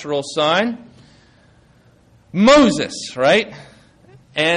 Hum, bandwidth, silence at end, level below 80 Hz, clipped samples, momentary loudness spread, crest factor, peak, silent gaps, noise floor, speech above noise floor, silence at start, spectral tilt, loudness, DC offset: none; 10.5 kHz; 0 s; -50 dBFS; under 0.1%; 16 LU; 16 dB; -2 dBFS; none; -52 dBFS; 36 dB; 0 s; -4.5 dB/octave; -16 LUFS; under 0.1%